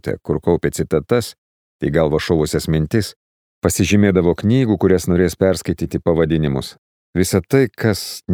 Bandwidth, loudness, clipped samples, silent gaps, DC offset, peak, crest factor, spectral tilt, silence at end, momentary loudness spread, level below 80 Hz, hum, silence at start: 19.5 kHz; -17 LUFS; under 0.1%; 1.38-1.79 s, 3.16-3.62 s, 6.78-7.13 s; under 0.1%; -2 dBFS; 16 dB; -6 dB/octave; 0 s; 7 LU; -38 dBFS; none; 0.05 s